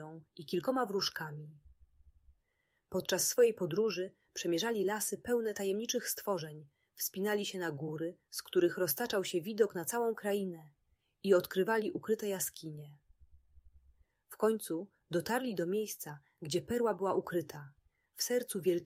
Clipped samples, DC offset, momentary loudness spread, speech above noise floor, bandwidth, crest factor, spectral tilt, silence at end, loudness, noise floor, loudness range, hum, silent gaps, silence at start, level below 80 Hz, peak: under 0.1%; under 0.1%; 13 LU; 46 dB; 16 kHz; 20 dB; -4 dB/octave; 0 s; -35 LUFS; -81 dBFS; 4 LU; none; none; 0 s; -72 dBFS; -16 dBFS